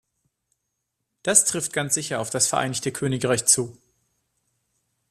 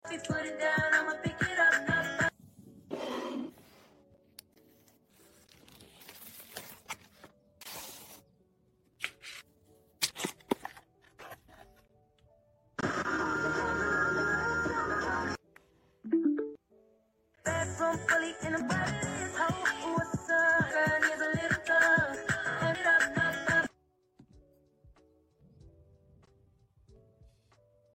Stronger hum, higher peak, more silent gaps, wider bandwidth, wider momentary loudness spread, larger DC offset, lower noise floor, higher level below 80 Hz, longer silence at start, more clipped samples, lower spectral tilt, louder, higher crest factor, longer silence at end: neither; first, -2 dBFS vs -12 dBFS; neither; about the same, 15 kHz vs 16.5 kHz; second, 9 LU vs 21 LU; neither; first, -79 dBFS vs -70 dBFS; about the same, -62 dBFS vs -60 dBFS; first, 1.25 s vs 0.05 s; neither; second, -2.5 dB/octave vs -4 dB/octave; first, -21 LUFS vs -30 LUFS; about the same, 24 dB vs 22 dB; second, 1.4 s vs 2.25 s